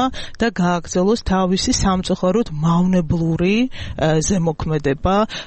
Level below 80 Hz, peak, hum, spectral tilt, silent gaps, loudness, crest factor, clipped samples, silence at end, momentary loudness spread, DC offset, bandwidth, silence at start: -34 dBFS; -6 dBFS; none; -5.5 dB/octave; none; -18 LUFS; 12 dB; under 0.1%; 0 s; 4 LU; under 0.1%; 8.8 kHz; 0 s